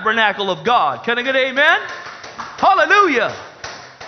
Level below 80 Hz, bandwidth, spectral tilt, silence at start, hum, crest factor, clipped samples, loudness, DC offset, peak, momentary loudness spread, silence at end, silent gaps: -58 dBFS; 6.6 kHz; -3 dB/octave; 0 s; none; 18 dB; under 0.1%; -15 LUFS; under 0.1%; 0 dBFS; 19 LU; 0 s; none